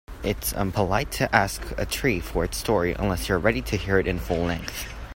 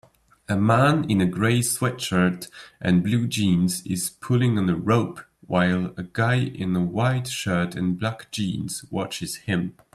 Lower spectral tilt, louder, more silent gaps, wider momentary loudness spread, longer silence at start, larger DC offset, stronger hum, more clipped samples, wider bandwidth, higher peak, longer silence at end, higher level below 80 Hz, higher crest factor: about the same, -5 dB/octave vs -5.5 dB/octave; about the same, -25 LUFS vs -23 LUFS; neither; about the same, 7 LU vs 9 LU; second, 0.1 s vs 0.5 s; neither; neither; neither; first, 16.5 kHz vs 14 kHz; first, -2 dBFS vs -6 dBFS; second, 0.05 s vs 0.25 s; first, -36 dBFS vs -56 dBFS; first, 24 dB vs 18 dB